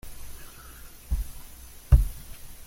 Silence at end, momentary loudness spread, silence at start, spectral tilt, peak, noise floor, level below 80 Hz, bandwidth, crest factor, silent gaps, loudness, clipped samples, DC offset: 0.05 s; 23 LU; 0.05 s; -6 dB/octave; -4 dBFS; -45 dBFS; -30 dBFS; 17 kHz; 22 dB; none; -27 LUFS; under 0.1%; under 0.1%